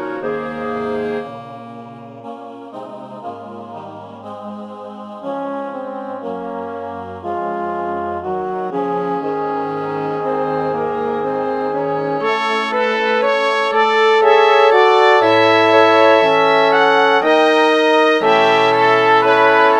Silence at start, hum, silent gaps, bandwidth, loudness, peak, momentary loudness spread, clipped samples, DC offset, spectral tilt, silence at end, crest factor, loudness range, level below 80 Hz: 0 s; none; none; 9.4 kHz; -15 LUFS; 0 dBFS; 21 LU; under 0.1%; under 0.1%; -4.5 dB/octave; 0 s; 16 dB; 18 LU; -60 dBFS